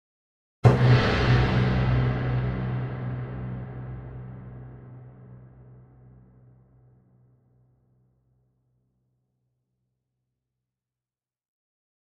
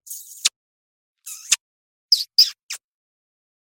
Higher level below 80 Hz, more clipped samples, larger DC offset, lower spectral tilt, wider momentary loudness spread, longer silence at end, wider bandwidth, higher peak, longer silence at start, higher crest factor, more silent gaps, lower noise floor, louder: first, -40 dBFS vs -70 dBFS; neither; neither; first, -8 dB/octave vs 5 dB/octave; first, 24 LU vs 19 LU; first, 6.6 s vs 1 s; second, 7 kHz vs 17 kHz; about the same, -4 dBFS vs -2 dBFS; first, 0.65 s vs 0.1 s; about the same, 24 dB vs 24 dB; second, none vs 0.56-1.15 s, 1.61-2.09 s, 2.63-2.69 s; about the same, under -90 dBFS vs under -90 dBFS; second, -24 LUFS vs -18 LUFS